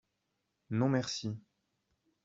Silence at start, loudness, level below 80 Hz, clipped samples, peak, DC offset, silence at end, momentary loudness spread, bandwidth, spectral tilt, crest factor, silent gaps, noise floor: 0.7 s; -34 LUFS; -74 dBFS; under 0.1%; -18 dBFS; under 0.1%; 0.85 s; 11 LU; 7.8 kHz; -6 dB/octave; 18 dB; none; -83 dBFS